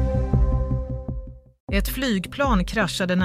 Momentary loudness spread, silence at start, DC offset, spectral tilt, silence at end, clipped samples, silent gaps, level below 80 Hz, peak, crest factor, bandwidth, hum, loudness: 13 LU; 0 s; under 0.1%; -6 dB/octave; 0 s; under 0.1%; 1.60-1.67 s; -28 dBFS; -8 dBFS; 16 dB; 16 kHz; none; -24 LUFS